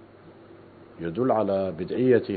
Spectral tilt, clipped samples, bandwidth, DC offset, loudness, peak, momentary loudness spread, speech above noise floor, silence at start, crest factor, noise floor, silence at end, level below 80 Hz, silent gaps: -11.5 dB/octave; under 0.1%; 4.7 kHz; under 0.1%; -25 LUFS; -8 dBFS; 11 LU; 26 dB; 0.25 s; 18 dB; -49 dBFS; 0 s; -64 dBFS; none